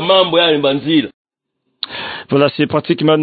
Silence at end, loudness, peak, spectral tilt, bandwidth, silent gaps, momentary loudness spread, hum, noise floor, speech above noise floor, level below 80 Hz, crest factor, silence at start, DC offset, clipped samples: 0 s; -14 LUFS; 0 dBFS; -11 dB/octave; 4.8 kHz; 1.14-1.25 s; 14 LU; none; -71 dBFS; 58 dB; -58 dBFS; 14 dB; 0 s; under 0.1%; under 0.1%